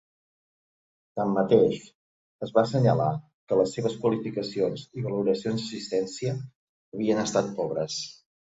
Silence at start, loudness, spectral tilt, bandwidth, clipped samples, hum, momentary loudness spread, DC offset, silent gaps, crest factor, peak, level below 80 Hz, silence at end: 1.15 s; -27 LUFS; -6 dB/octave; 8 kHz; under 0.1%; none; 15 LU; under 0.1%; 1.95-2.39 s, 3.34-3.47 s, 6.56-6.92 s; 20 dB; -8 dBFS; -64 dBFS; 0.45 s